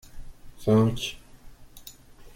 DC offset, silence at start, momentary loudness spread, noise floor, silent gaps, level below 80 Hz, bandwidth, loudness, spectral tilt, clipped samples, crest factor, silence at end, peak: under 0.1%; 0.15 s; 25 LU; -48 dBFS; none; -46 dBFS; 16.5 kHz; -25 LUFS; -6.5 dB/octave; under 0.1%; 18 dB; 0.05 s; -10 dBFS